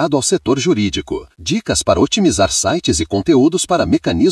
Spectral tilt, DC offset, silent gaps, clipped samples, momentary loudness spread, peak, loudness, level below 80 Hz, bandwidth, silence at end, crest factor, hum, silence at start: -4 dB/octave; under 0.1%; none; under 0.1%; 7 LU; 0 dBFS; -15 LUFS; -38 dBFS; 12 kHz; 0 s; 14 dB; none; 0 s